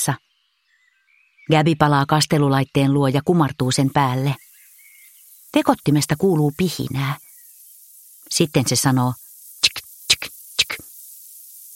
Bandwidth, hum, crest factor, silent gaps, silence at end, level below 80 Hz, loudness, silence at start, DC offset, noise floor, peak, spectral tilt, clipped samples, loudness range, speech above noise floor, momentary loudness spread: 17 kHz; none; 20 dB; none; 0 s; -54 dBFS; -19 LUFS; 0 s; under 0.1%; -66 dBFS; 0 dBFS; -4.5 dB/octave; under 0.1%; 4 LU; 48 dB; 16 LU